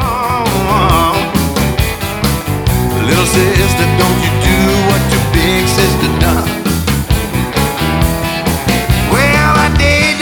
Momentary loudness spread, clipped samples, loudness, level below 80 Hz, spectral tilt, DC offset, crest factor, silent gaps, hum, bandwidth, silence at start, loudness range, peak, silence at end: 5 LU; under 0.1%; -12 LUFS; -20 dBFS; -5 dB/octave; under 0.1%; 12 dB; none; none; over 20 kHz; 0 s; 2 LU; 0 dBFS; 0 s